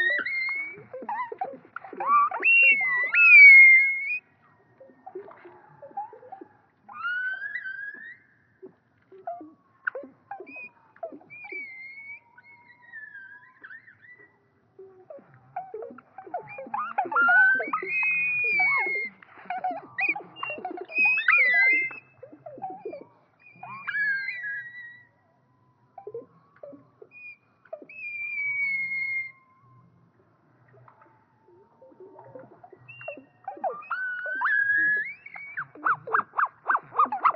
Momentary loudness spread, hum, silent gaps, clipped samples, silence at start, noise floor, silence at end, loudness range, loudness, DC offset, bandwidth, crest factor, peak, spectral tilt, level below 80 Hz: 25 LU; none; none; under 0.1%; 0 s; -65 dBFS; 0 s; 26 LU; -20 LUFS; under 0.1%; 5.6 kHz; 22 dB; -6 dBFS; 1.5 dB/octave; -86 dBFS